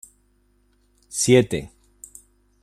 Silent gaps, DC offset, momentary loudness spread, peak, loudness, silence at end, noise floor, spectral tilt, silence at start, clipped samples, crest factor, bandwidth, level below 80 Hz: none; under 0.1%; 26 LU; -4 dBFS; -20 LUFS; 0.95 s; -62 dBFS; -4.5 dB/octave; 1.15 s; under 0.1%; 22 dB; 15 kHz; -54 dBFS